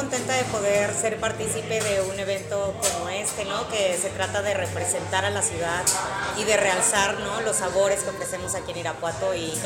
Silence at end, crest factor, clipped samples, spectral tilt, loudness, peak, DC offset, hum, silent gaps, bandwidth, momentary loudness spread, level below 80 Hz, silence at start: 0 s; 18 dB; under 0.1%; -2.5 dB/octave; -24 LUFS; -6 dBFS; under 0.1%; none; none; 17 kHz; 7 LU; -52 dBFS; 0 s